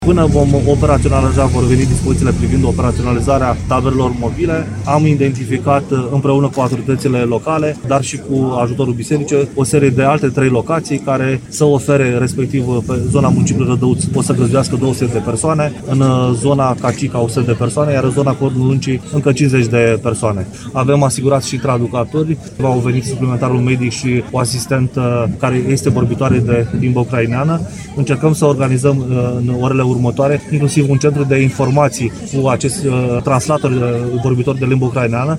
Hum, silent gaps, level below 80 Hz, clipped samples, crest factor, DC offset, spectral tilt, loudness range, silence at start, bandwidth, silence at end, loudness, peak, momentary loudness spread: none; none; -32 dBFS; under 0.1%; 14 dB; under 0.1%; -6.5 dB/octave; 2 LU; 0 s; 13 kHz; 0 s; -14 LUFS; 0 dBFS; 5 LU